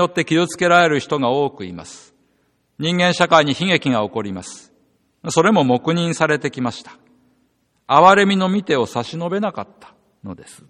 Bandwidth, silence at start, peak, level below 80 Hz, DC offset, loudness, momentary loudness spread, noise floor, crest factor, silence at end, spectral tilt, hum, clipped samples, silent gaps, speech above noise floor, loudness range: 12 kHz; 0 s; 0 dBFS; -60 dBFS; under 0.1%; -17 LUFS; 20 LU; -64 dBFS; 18 dB; 0.15 s; -5 dB/octave; none; under 0.1%; none; 46 dB; 3 LU